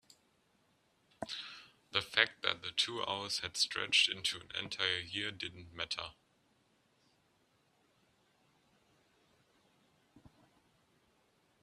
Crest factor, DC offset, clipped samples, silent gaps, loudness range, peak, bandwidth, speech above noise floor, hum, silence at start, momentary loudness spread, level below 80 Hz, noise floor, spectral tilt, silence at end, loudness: 30 dB; under 0.1%; under 0.1%; none; 14 LU; -10 dBFS; 14 kHz; 37 dB; none; 1.2 s; 15 LU; -74 dBFS; -74 dBFS; -1 dB/octave; 1.45 s; -35 LUFS